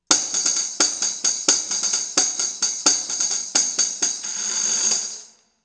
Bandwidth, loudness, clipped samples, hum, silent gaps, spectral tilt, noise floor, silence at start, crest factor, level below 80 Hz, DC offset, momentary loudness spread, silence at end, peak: 10.5 kHz; -19 LUFS; under 0.1%; none; none; 2 dB/octave; -43 dBFS; 0.1 s; 22 dB; -76 dBFS; under 0.1%; 5 LU; 0.35 s; 0 dBFS